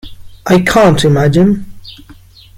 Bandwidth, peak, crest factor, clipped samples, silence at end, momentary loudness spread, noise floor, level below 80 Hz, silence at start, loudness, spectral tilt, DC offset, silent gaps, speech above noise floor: 16 kHz; 0 dBFS; 12 dB; under 0.1%; 0.65 s; 9 LU; -38 dBFS; -34 dBFS; 0.05 s; -10 LUFS; -6 dB/octave; under 0.1%; none; 30 dB